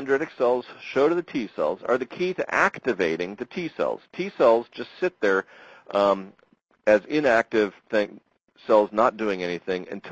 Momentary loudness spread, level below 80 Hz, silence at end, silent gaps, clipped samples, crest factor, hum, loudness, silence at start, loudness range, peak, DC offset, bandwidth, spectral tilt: 10 LU; -62 dBFS; 0 s; 8.44-8.48 s; under 0.1%; 18 dB; none; -24 LUFS; 0 s; 2 LU; -6 dBFS; under 0.1%; 8.2 kHz; -5.5 dB/octave